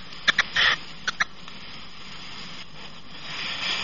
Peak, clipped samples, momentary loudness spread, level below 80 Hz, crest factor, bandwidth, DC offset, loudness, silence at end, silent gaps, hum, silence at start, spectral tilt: -4 dBFS; under 0.1%; 20 LU; -56 dBFS; 26 dB; 7.2 kHz; 1%; -24 LUFS; 0 s; none; none; 0 s; 1.5 dB/octave